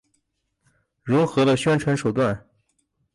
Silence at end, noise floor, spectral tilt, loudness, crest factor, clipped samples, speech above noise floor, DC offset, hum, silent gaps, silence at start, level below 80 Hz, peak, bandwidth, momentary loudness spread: 0.75 s; -74 dBFS; -6.5 dB/octave; -21 LUFS; 14 dB; under 0.1%; 53 dB; under 0.1%; none; none; 1.05 s; -56 dBFS; -10 dBFS; 11.5 kHz; 10 LU